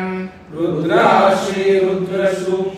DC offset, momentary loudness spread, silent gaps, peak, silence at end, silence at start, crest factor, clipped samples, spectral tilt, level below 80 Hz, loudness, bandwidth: under 0.1%; 12 LU; none; 0 dBFS; 0 s; 0 s; 16 dB; under 0.1%; -6 dB/octave; -54 dBFS; -16 LUFS; 13 kHz